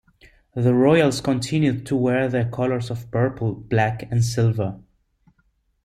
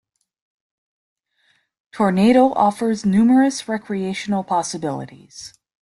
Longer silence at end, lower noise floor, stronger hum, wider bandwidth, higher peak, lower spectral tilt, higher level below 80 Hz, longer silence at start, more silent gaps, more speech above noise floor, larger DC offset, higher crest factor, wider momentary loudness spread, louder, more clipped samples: first, 1.05 s vs 0.35 s; about the same, -66 dBFS vs -64 dBFS; neither; about the same, 13 kHz vs 12 kHz; about the same, -4 dBFS vs -2 dBFS; about the same, -6.5 dB/octave vs -6 dB/octave; first, -52 dBFS vs -60 dBFS; second, 0.55 s vs 1.95 s; neither; about the same, 46 dB vs 46 dB; neither; about the same, 16 dB vs 18 dB; second, 10 LU vs 22 LU; second, -21 LUFS vs -18 LUFS; neither